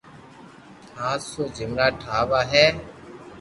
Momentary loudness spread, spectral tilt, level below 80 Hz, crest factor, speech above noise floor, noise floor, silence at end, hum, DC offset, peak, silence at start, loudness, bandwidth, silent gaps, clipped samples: 24 LU; -4 dB/octave; -48 dBFS; 24 dB; 24 dB; -46 dBFS; 0 s; none; under 0.1%; -2 dBFS; 0.05 s; -22 LUFS; 11.5 kHz; none; under 0.1%